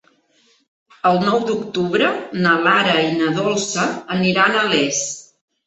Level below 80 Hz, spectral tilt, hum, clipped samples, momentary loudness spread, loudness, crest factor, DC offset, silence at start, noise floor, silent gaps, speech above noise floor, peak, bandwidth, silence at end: -60 dBFS; -3.5 dB/octave; none; under 0.1%; 7 LU; -17 LUFS; 16 dB; under 0.1%; 1.05 s; -59 dBFS; none; 41 dB; -2 dBFS; 8.2 kHz; 0.45 s